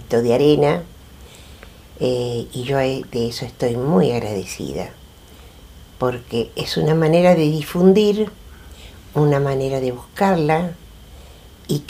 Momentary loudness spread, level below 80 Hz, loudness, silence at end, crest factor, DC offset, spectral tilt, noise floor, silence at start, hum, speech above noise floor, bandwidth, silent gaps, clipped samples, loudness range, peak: 12 LU; -44 dBFS; -19 LUFS; 0 s; 18 dB; under 0.1%; -6.5 dB/octave; -43 dBFS; 0 s; none; 25 dB; 15.5 kHz; none; under 0.1%; 6 LU; -2 dBFS